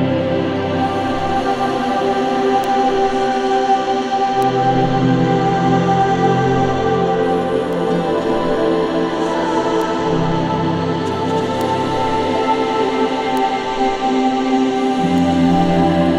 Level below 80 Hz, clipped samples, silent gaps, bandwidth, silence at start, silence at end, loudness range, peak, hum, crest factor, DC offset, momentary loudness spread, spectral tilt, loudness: -40 dBFS; under 0.1%; none; 13.5 kHz; 0 s; 0 s; 2 LU; -2 dBFS; none; 12 dB; under 0.1%; 4 LU; -6.5 dB/octave; -16 LUFS